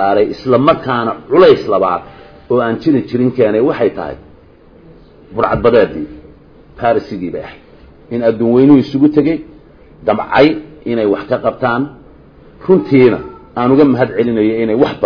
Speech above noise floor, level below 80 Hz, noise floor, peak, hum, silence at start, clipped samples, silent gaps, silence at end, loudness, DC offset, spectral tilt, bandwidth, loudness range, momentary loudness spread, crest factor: 30 dB; -42 dBFS; -42 dBFS; 0 dBFS; none; 0 s; 0.1%; none; 0 s; -13 LUFS; under 0.1%; -9 dB/octave; 5.4 kHz; 4 LU; 14 LU; 14 dB